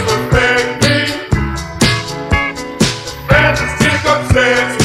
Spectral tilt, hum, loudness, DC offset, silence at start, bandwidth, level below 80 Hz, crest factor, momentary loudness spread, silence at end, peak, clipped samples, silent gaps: -4.5 dB/octave; none; -13 LUFS; under 0.1%; 0 s; 16 kHz; -26 dBFS; 14 dB; 7 LU; 0 s; 0 dBFS; under 0.1%; none